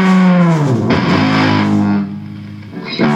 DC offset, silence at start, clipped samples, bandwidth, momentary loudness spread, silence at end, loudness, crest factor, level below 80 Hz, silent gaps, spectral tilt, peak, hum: under 0.1%; 0 s; under 0.1%; 8.4 kHz; 18 LU; 0 s; -12 LUFS; 12 dB; -46 dBFS; none; -7 dB/octave; -2 dBFS; none